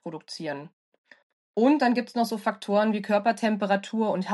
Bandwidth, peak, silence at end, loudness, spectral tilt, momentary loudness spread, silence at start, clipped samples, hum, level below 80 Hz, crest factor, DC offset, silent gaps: 12 kHz; -10 dBFS; 0 s; -25 LUFS; -6 dB/octave; 13 LU; 0.05 s; under 0.1%; none; -84 dBFS; 16 dB; under 0.1%; 0.73-0.92 s, 0.98-1.04 s, 1.23-1.54 s